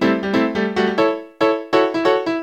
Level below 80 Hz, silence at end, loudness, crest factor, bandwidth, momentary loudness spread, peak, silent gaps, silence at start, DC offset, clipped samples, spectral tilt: -54 dBFS; 0 s; -18 LUFS; 18 dB; 15 kHz; 3 LU; 0 dBFS; none; 0 s; under 0.1%; under 0.1%; -6 dB/octave